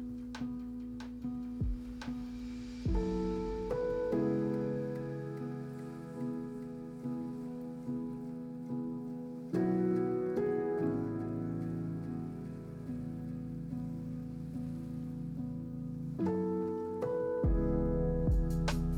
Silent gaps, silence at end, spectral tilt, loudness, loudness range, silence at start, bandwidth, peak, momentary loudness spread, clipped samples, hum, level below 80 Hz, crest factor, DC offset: none; 0 s; -8.5 dB/octave; -37 LUFS; 6 LU; 0 s; 15 kHz; -22 dBFS; 10 LU; under 0.1%; none; -44 dBFS; 12 dB; under 0.1%